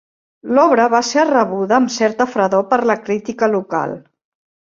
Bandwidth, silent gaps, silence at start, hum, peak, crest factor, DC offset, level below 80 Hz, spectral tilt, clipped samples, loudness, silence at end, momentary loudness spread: 7.6 kHz; none; 0.45 s; none; 0 dBFS; 16 dB; under 0.1%; -60 dBFS; -4.5 dB/octave; under 0.1%; -16 LUFS; 0.8 s; 9 LU